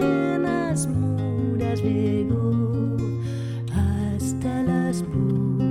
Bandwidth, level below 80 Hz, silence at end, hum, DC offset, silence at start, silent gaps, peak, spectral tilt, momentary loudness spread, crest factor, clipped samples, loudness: 14 kHz; -42 dBFS; 0 s; none; under 0.1%; 0 s; none; -10 dBFS; -7.5 dB/octave; 4 LU; 12 dB; under 0.1%; -24 LUFS